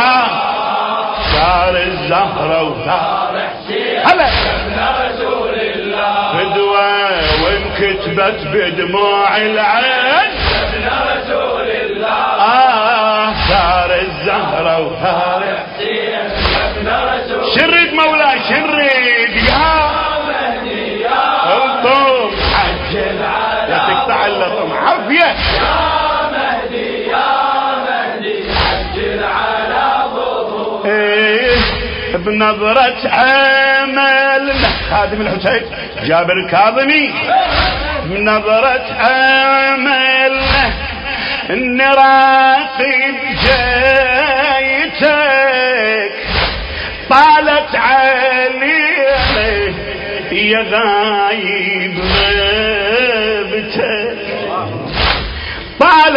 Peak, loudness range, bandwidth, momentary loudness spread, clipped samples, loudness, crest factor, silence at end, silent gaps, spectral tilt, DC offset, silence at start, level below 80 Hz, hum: 0 dBFS; 4 LU; 8 kHz; 8 LU; under 0.1%; -12 LUFS; 12 dB; 0 s; none; -6.5 dB/octave; under 0.1%; 0 s; -30 dBFS; none